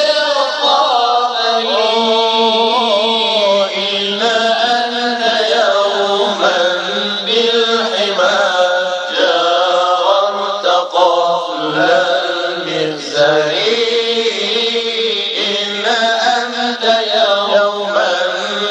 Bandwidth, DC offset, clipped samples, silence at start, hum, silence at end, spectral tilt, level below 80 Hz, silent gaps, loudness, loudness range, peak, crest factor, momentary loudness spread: 9.8 kHz; under 0.1%; under 0.1%; 0 s; none; 0 s; -2 dB/octave; -72 dBFS; none; -13 LUFS; 2 LU; 0 dBFS; 14 dB; 4 LU